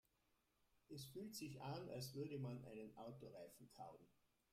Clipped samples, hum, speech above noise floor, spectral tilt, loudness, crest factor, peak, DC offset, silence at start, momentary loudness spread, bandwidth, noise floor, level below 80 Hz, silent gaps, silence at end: under 0.1%; none; 31 dB; -5.5 dB/octave; -54 LUFS; 16 dB; -38 dBFS; under 0.1%; 0.9 s; 10 LU; 16 kHz; -85 dBFS; -82 dBFS; none; 0.4 s